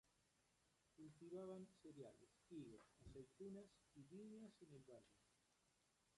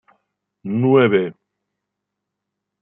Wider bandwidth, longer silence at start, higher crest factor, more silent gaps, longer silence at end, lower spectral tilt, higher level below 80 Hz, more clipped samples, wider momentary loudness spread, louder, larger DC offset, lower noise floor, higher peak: first, 11 kHz vs 3.7 kHz; second, 0.05 s vs 0.65 s; about the same, 16 dB vs 18 dB; neither; second, 0 s vs 1.5 s; second, -6.5 dB/octave vs -11.5 dB/octave; second, -82 dBFS vs -70 dBFS; neither; second, 10 LU vs 15 LU; second, -62 LUFS vs -17 LUFS; neither; about the same, -84 dBFS vs -81 dBFS; second, -46 dBFS vs -2 dBFS